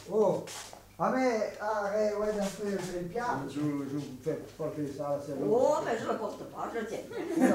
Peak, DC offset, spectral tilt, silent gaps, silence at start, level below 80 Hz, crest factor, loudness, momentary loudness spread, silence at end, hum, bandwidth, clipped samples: -12 dBFS; under 0.1%; -5.5 dB/octave; none; 0 s; -62 dBFS; 20 dB; -32 LUFS; 10 LU; 0 s; none; 16 kHz; under 0.1%